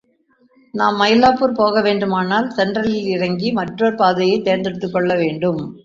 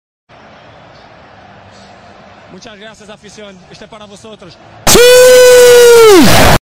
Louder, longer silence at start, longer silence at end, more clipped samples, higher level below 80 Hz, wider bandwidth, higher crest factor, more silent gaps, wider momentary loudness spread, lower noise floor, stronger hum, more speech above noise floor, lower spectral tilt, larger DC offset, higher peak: second, -17 LUFS vs -3 LUFS; first, 0.75 s vs 0.25 s; about the same, 0.05 s vs 0 s; second, under 0.1% vs 3%; second, -54 dBFS vs -28 dBFS; second, 7.6 kHz vs over 20 kHz; first, 16 dB vs 8 dB; neither; first, 7 LU vs 4 LU; first, -58 dBFS vs -37 dBFS; neither; first, 41 dB vs 31 dB; first, -6.5 dB/octave vs -3 dB/octave; neither; about the same, -2 dBFS vs 0 dBFS